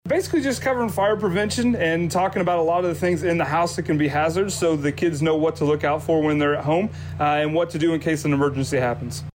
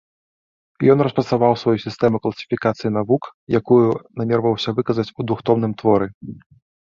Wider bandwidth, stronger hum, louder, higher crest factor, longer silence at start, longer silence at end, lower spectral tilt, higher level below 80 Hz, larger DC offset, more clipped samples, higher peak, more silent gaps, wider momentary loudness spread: first, 16.5 kHz vs 7.2 kHz; neither; second, -22 LUFS vs -19 LUFS; second, 10 dB vs 18 dB; second, 0.05 s vs 0.8 s; second, 0.05 s vs 0.45 s; second, -5.5 dB/octave vs -8 dB/octave; about the same, -50 dBFS vs -54 dBFS; neither; neither; second, -12 dBFS vs -2 dBFS; second, none vs 3.34-3.47 s, 6.15-6.21 s; second, 2 LU vs 8 LU